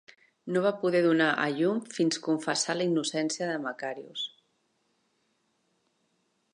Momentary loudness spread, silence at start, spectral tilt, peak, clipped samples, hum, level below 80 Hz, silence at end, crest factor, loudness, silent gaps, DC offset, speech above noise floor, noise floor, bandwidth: 12 LU; 0.45 s; -4 dB/octave; -12 dBFS; under 0.1%; none; -84 dBFS; 2.25 s; 18 dB; -28 LUFS; none; under 0.1%; 46 dB; -74 dBFS; 11 kHz